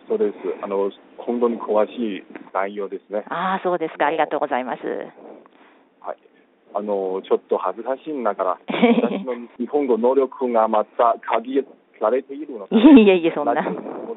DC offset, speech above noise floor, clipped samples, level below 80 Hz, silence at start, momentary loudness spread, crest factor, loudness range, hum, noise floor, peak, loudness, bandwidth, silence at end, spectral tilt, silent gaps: under 0.1%; 36 dB; under 0.1%; -62 dBFS; 0.1 s; 13 LU; 18 dB; 10 LU; none; -56 dBFS; -2 dBFS; -20 LUFS; 4.1 kHz; 0 s; -4.5 dB/octave; none